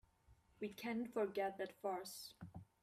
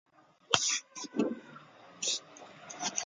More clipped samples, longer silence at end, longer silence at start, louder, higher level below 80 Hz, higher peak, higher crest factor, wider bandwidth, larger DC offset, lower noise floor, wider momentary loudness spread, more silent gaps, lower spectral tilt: neither; first, 0.2 s vs 0 s; second, 0.3 s vs 0.5 s; second, -45 LUFS vs -33 LUFS; about the same, -78 dBFS vs -76 dBFS; second, -30 dBFS vs -4 dBFS; second, 16 dB vs 32 dB; first, 15.5 kHz vs 11 kHz; neither; first, -72 dBFS vs -54 dBFS; second, 12 LU vs 23 LU; neither; first, -4.5 dB/octave vs -1 dB/octave